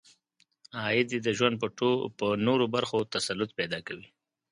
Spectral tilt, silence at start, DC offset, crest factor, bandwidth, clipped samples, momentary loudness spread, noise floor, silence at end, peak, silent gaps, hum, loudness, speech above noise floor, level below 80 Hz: -4.5 dB/octave; 0.75 s; under 0.1%; 20 dB; 11 kHz; under 0.1%; 10 LU; -71 dBFS; 0.5 s; -10 dBFS; none; none; -29 LUFS; 42 dB; -66 dBFS